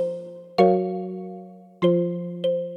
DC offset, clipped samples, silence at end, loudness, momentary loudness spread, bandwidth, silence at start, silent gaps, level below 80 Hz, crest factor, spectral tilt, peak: under 0.1%; under 0.1%; 0 s; -23 LUFS; 16 LU; 6.6 kHz; 0 s; none; -70 dBFS; 20 dB; -8.5 dB/octave; -4 dBFS